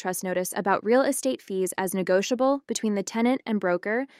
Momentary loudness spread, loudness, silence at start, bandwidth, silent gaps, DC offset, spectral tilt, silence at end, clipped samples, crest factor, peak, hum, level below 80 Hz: 6 LU; -25 LUFS; 0 s; 16 kHz; none; under 0.1%; -4.5 dB/octave; 0.15 s; under 0.1%; 16 dB; -8 dBFS; none; -74 dBFS